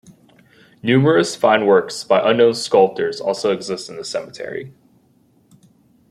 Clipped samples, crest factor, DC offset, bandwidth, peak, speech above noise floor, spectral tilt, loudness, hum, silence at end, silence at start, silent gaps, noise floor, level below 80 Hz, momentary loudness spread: under 0.1%; 18 dB; under 0.1%; 13 kHz; -2 dBFS; 40 dB; -5 dB/octave; -17 LUFS; none; 1.4 s; 0.85 s; none; -57 dBFS; -64 dBFS; 13 LU